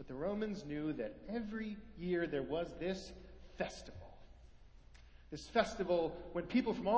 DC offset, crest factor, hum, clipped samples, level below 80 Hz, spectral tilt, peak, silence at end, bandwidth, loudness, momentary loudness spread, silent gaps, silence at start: under 0.1%; 22 dB; none; under 0.1%; -60 dBFS; -6 dB/octave; -18 dBFS; 0 s; 8 kHz; -40 LUFS; 17 LU; none; 0 s